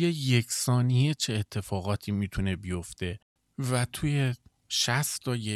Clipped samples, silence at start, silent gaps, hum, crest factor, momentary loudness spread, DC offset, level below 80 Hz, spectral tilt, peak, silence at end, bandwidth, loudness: under 0.1%; 0 s; 3.22-3.36 s; none; 16 dB; 11 LU; under 0.1%; -52 dBFS; -4.5 dB/octave; -12 dBFS; 0 s; 14 kHz; -29 LUFS